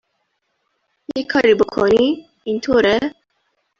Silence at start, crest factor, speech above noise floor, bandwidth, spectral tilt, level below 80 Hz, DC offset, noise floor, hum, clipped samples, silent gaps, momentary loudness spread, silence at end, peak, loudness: 1.15 s; 16 dB; 54 dB; 7.4 kHz; -5 dB/octave; -50 dBFS; under 0.1%; -70 dBFS; none; under 0.1%; none; 12 LU; 0.7 s; -2 dBFS; -17 LUFS